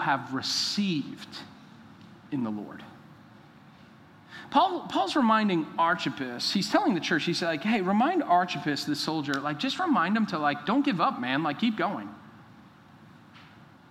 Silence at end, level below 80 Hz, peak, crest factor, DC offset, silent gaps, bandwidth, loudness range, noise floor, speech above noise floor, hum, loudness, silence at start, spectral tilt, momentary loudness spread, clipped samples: 0.3 s; -76 dBFS; -8 dBFS; 20 dB; under 0.1%; none; 15.5 kHz; 7 LU; -53 dBFS; 26 dB; none; -27 LUFS; 0 s; -4.5 dB/octave; 14 LU; under 0.1%